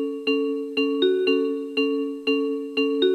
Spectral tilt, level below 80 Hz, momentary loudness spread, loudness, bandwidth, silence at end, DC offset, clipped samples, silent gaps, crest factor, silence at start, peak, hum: -4 dB/octave; -74 dBFS; 4 LU; -23 LUFS; 9.8 kHz; 0 s; under 0.1%; under 0.1%; none; 14 dB; 0 s; -8 dBFS; none